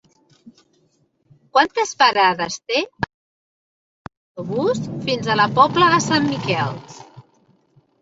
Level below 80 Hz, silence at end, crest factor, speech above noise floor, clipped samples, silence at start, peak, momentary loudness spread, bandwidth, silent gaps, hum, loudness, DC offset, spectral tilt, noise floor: -56 dBFS; 0.8 s; 20 dB; 45 dB; under 0.1%; 0.45 s; -2 dBFS; 14 LU; 8 kHz; 3.14-4.05 s, 4.17-4.35 s; none; -18 LUFS; under 0.1%; -4 dB/octave; -63 dBFS